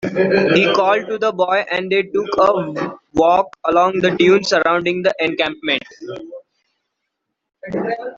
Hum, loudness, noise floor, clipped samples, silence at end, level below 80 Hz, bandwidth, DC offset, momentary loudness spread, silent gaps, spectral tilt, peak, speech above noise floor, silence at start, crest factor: none; -16 LUFS; -76 dBFS; under 0.1%; 0 s; -54 dBFS; 7.6 kHz; under 0.1%; 12 LU; none; -5 dB/octave; -2 dBFS; 60 dB; 0 s; 16 dB